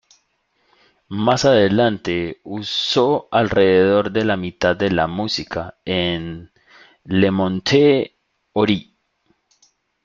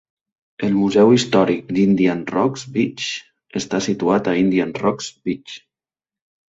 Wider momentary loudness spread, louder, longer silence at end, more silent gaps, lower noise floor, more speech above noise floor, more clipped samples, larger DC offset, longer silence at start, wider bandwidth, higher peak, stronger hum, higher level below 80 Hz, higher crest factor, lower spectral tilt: about the same, 13 LU vs 14 LU; about the same, -18 LUFS vs -18 LUFS; first, 1.2 s vs 0.9 s; neither; second, -66 dBFS vs under -90 dBFS; second, 48 dB vs over 72 dB; neither; neither; first, 1.1 s vs 0.6 s; about the same, 7.6 kHz vs 8 kHz; about the same, -2 dBFS vs -2 dBFS; neither; about the same, -52 dBFS vs -56 dBFS; about the same, 18 dB vs 16 dB; about the same, -5.5 dB/octave vs -5.5 dB/octave